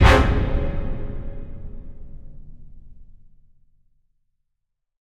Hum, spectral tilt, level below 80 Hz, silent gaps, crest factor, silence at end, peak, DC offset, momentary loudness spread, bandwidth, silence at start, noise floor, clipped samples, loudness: none; -6.5 dB/octave; -26 dBFS; none; 24 dB; 1.95 s; 0 dBFS; 0.5%; 27 LU; 11.5 kHz; 0 s; -77 dBFS; under 0.1%; -23 LUFS